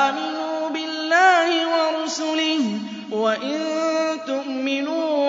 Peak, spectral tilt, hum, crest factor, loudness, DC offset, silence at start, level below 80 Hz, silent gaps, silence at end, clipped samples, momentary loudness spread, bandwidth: -4 dBFS; -3 dB/octave; none; 16 dB; -21 LUFS; under 0.1%; 0 s; -78 dBFS; none; 0 s; under 0.1%; 10 LU; 7.8 kHz